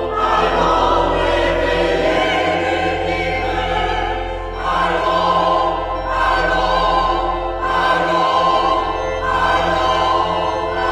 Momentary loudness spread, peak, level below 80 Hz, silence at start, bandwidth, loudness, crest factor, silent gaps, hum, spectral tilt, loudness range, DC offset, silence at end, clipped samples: 5 LU; -2 dBFS; -30 dBFS; 0 s; 13 kHz; -17 LUFS; 14 dB; none; none; -5 dB/octave; 2 LU; under 0.1%; 0 s; under 0.1%